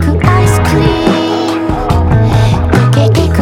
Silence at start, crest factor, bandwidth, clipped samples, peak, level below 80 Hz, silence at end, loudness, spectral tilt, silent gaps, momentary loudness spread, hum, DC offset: 0 s; 8 dB; 15.5 kHz; under 0.1%; 0 dBFS; -20 dBFS; 0 s; -10 LUFS; -6.5 dB/octave; none; 4 LU; none; under 0.1%